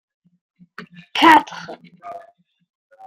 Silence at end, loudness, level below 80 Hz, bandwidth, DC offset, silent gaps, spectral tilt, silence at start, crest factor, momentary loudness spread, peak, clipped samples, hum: 0.9 s; -14 LUFS; -68 dBFS; 16 kHz; under 0.1%; none; -3 dB/octave; 0.8 s; 20 dB; 28 LU; -2 dBFS; under 0.1%; none